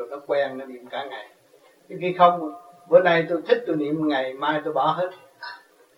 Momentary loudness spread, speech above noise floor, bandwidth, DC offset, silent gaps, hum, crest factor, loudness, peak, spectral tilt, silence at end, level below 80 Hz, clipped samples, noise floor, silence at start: 21 LU; 34 dB; 11.5 kHz; under 0.1%; none; none; 22 dB; -22 LUFS; -2 dBFS; -7 dB/octave; 0.4 s; -78 dBFS; under 0.1%; -56 dBFS; 0 s